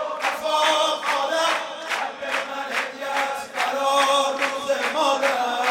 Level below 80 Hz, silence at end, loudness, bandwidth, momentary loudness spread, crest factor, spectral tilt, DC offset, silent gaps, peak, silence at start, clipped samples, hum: -74 dBFS; 0 s; -22 LUFS; 16.5 kHz; 7 LU; 16 dB; -0.5 dB/octave; under 0.1%; none; -6 dBFS; 0 s; under 0.1%; none